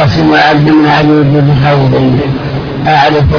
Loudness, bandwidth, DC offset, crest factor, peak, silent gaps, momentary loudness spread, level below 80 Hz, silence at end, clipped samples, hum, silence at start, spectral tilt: -7 LUFS; 5.4 kHz; under 0.1%; 6 dB; 0 dBFS; none; 8 LU; -26 dBFS; 0 s; 0.8%; none; 0 s; -8 dB/octave